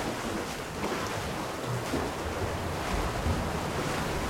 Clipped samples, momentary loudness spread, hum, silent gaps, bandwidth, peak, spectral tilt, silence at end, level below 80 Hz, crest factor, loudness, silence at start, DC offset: under 0.1%; 3 LU; none; none; 16.5 kHz; -16 dBFS; -4.5 dB/octave; 0 s; -42 dBFS; 16 dB; -32 LUFS; 0 s; under 0.1%